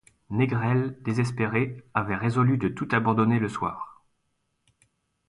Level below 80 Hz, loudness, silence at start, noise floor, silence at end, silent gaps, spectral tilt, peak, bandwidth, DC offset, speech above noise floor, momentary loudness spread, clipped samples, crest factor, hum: -56 dBFS; -26 LUFS; 0.3 s; -75 dBFS; 1.35 s; none; -8 dB/octave; -8 dBFS; 11 kHz; under 0.1%; 50 dB; 8 LU; under 0.1%; 18 dB; none